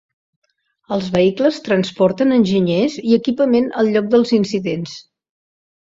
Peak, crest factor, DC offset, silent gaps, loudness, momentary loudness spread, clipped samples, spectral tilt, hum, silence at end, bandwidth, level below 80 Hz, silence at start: -2 dBFS; 16 dB; under 0.1%; none; -16 LUFS; 9 LU; under 0.1%; -6.5 dB/octave; none; 0.95 s; 7.8 kHz; -54 dBFS; 0.9 s